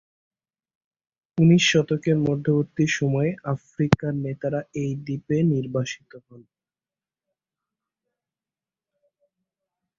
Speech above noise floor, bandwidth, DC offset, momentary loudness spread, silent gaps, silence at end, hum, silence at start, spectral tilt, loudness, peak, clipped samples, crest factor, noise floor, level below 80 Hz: over 68 dB; 7.6 kHz; under 0.1%; 12 LU; none; 3.6 s; none; 1.35 s; -6 dB/octave; -23 LUFS; -2 dBFS; under 0.1%; 24 dB; under -90 dBFS; -56 dBFS